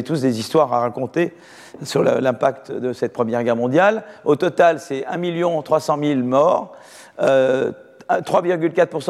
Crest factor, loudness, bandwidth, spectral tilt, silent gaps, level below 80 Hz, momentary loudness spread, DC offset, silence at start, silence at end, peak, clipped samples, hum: 16 dB; -19 LUFS; 14 kHz; -6 dB/octave; none; -70 dBFS; 9 LU; under 0.1%; 0 s; 0 s; -2 dBFS; under 0.1%; none